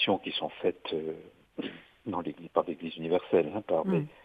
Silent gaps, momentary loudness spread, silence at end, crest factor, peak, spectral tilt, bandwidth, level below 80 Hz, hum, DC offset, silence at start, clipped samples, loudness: none; 13 LU; 0.1 s; 22 dB; -10 dBFS; -8 dB/octave; 5 kHz; -70 dBFS; none; under 0.1%; 0 s; under 0.1%; -32 LUFS